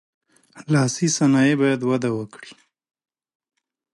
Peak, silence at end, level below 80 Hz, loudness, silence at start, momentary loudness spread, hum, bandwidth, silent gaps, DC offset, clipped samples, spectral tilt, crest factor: -8 dBFS; 1.4 s; -68 dBFS; -20 LUFS; 0.55 s; 10 LU; none; 11.5 kHz; none; under 0.1%; under 0.1%; -5 dB/octave; 16 dB